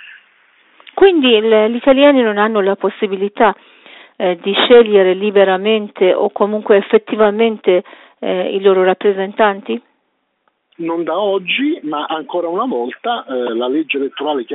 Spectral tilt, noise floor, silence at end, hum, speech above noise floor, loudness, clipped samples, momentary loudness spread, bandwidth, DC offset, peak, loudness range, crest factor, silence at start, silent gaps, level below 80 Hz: -2.5 dB/octave; -66 dBFS; 0 s; none; 53 dB; -14 LUFS; under 0.1%; 11 LU; 4.1 kHz; under 0.1%; 0 dBFS; 6 LU; 14 dB; 0.05 s; none; -56 dBFS